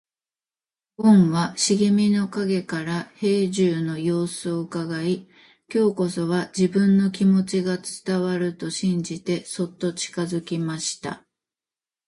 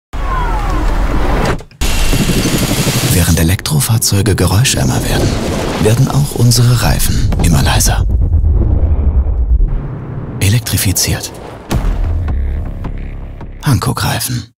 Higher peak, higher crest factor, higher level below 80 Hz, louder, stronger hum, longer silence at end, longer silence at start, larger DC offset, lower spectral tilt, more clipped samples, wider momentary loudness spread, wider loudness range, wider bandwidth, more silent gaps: second, -6 dBFS vs -2 dBFS; first, 16 dB vs 10 dB; second, -64 dBFS vs -16 dBFS; second, -23 LUFS vs -13 LUFS; neither; first, 0.9 s vs 0.1 s; first, 1 s vs 0.15 s; neither; about the same, -5.5 dB/octave vs -4.5 dB/octave; neither; about the same, 9 LU vs 10 LU; about the same, 5 LU vs 5 LU; second, 11.5 kHz vs 16.5 kHz; neither